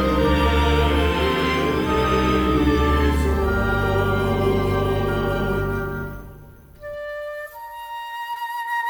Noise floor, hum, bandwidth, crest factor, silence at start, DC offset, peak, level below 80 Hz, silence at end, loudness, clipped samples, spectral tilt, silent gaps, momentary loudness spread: -43 dBFS; none; over 20 kHz; 14 dB; 0 s; under 0.1%; -6 dBFS; -28 dBFS; 0 s; -21 LUFS; under 0.1%; -6.5 dB/octave; none; 14 LU